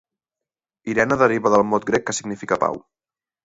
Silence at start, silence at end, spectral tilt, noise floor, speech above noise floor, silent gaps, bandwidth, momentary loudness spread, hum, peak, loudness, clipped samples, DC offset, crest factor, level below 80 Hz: 0.85 s; 0.65 s; -5 dB/octave; -88 dBFS; 69 dB; none; 8 kHz; 10 LU; none; -2 dBFS; -20 LUFS; under 0.1%; under 0.1%; 20 dB; -54 dBFS